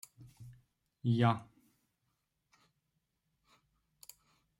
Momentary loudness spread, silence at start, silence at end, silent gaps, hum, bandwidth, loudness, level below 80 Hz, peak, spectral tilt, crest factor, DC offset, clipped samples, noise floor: 26 LU; 0.2 s; 3.15 s; none; none; 16 kHz; -33 LUFS; -74 dBFS; -16 dBFS; -7 dB/octave; 24 dB; under 0.1%; under 0.1%; -83 dBFS